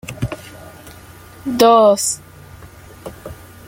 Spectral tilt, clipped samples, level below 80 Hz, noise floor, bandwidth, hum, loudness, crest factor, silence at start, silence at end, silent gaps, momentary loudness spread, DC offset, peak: -4 dB/octave; under 0.1%; -46 dBFS; -40 dBFS; 17 kHz; none; -15 LUFS; 18 dB; 0.1 s; 0.35 s; none; 26 LU; under 0.1%; -2 dBFS